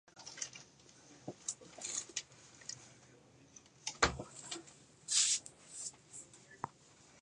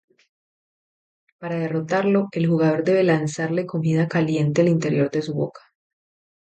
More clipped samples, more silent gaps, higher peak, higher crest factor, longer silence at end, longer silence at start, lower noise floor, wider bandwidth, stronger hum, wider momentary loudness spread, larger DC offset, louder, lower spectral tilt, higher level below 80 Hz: neither; neither; second, -14 dBFS vs -6 dBFS; first, 30 dB vs 16 dB; second, 0 s vs 0.9 s; second, 0.15 s vs 1.4 s; second, -64 dBFS vs under -90 dBFS; first, 11.5 kHz vs 8.8 kHz; neither; first, 26 LU vs 8 LU; neither; second, -38 LUFS vs -21 LUFS; second, -0.5 dB/octave vs -7.5 dB/octave; about the same, -62 dBFS vs -66 dBFS